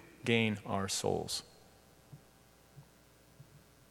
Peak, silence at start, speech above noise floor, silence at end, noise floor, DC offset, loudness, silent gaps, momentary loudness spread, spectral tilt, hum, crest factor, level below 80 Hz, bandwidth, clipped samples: -14 dBFS; 0 s; 29 dB; 0.3 s; -63 dBFS; under 0.1%; -34 LUFS; none; 27 LU; -4 dB/octave; none; 24 dB; -68 dBFS; 18.5 kHz; under 0.1%